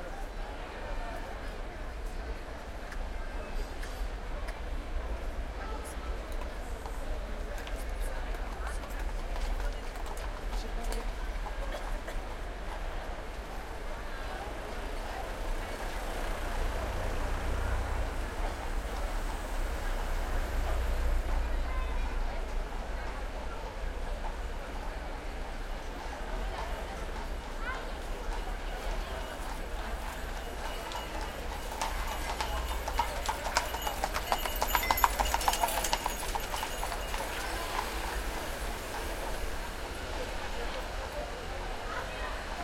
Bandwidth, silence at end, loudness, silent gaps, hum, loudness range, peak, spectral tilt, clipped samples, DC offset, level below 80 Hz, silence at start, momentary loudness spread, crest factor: 16.5 kHz; 0 s; -37 LUFS; none; none; 9 LU; -6 dBFS; -3.5 dB/octave; under 0.1%; under 0.1%; -36 dBFS; 0 s; 9 LU; 28 dB